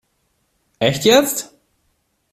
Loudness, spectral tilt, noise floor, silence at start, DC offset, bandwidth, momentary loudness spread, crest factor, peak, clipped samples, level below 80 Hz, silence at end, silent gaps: -16 LUFS; -3.5 dB/octave; -67 dBFS; 0.8 s; under 0.1%; 16 kHz; 14 LU; 20 dB; 0 dBFS; under 0.1%; -54 dBFS; 0.85 s; none